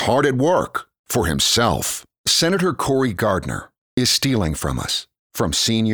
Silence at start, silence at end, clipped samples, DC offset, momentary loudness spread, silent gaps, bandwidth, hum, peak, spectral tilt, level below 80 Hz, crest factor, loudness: 0 s; 0 s; under 0.1%; 0.1%; 10 LU; 0.99-1.04 s, 2.18-2.24 s, 3.78-3.97 s, 5.19-5.30 s; over 20 kHz; none; -4 dBFS; -3.5 dB/octave; -40 dBFS; 16 dB; -19 LUFS